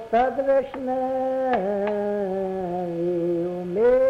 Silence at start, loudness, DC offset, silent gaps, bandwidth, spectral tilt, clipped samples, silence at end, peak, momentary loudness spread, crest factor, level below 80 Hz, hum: 0 s; -24 LUFS; under 0.1%; none; 6.6 kHz; -8.5 dB/octave; under 0.1%; 0 s; -10 dBFS; 6 LU; 12 dB; -54 dBFS; none